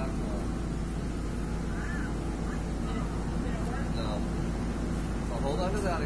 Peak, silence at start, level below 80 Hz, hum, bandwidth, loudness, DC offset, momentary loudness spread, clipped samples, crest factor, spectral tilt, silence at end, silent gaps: -18 dBFS; 0 s; -36 dBFS; none; 11 kHz; -33 LUFS; 0.3%; 4 LU; under 0.1%; 14 dB; -6.5 dB/octave; 0 s; none